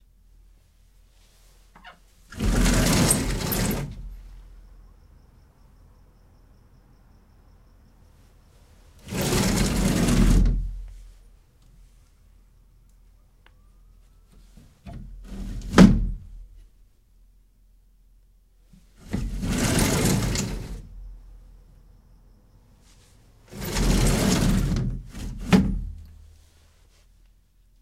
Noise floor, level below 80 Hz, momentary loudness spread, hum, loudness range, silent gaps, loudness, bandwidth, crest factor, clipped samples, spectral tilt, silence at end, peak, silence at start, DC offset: -59 dBFS; -32 dBFS; 24 LU; none; 12 LU; none; -23 LUFS; 16 kHz; 26 dB; under 0.1%; -5 dB/octave; 1.7 s; 0 dBFS; 1.85 s; under 0.1%